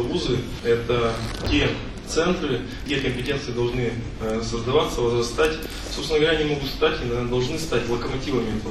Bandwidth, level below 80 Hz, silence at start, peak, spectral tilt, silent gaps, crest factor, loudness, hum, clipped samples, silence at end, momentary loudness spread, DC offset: 13.5 kHz; -36 dBFS; 0 s; -6 dBFS; -5 dB/octave; none; 18 dB; -24 LUFS; none; under 0.1%; 0 s; 6 LU; under 0.1%